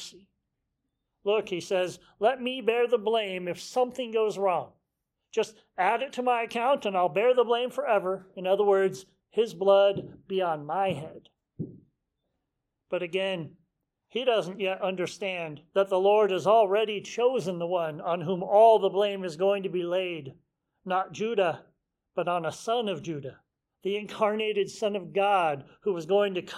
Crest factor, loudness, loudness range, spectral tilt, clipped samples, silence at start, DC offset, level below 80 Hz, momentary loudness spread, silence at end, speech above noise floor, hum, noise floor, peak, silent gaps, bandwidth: 20 dB; -27 LUFS; 6 LU; -5 dB/octave; under 0.1%; 0 s; under 0.1%; -74 dBFS; 13 LU; 0 s; 56 dB; none; -83 dBFS; -8 dBFS; none; 13.5 kHz